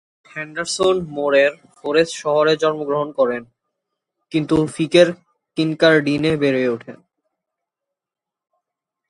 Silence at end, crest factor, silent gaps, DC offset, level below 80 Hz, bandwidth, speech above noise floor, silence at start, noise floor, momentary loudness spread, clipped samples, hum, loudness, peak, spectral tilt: 2.15 s; 20 dB; none; under 0.1%; -54 dBFS; 11.5 kHz; 69 dB; 0.35 s; -87 dBFS; 15 LU; under 0.1%; none; -18 LUFS; 0 dBFS; -5 dB/octave